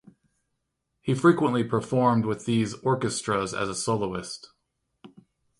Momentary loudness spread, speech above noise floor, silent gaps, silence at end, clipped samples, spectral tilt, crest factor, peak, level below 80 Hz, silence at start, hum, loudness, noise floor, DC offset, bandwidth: 12 LU; 54 dB; none; 0.55 s; under 0.1%; -5.5 dB/octave; 20 dB; -6 dBFS; -60 dBFS; 1.05 s; none; -25 LUFS; -79 dBFS; under 0.1%; 11.5 kHz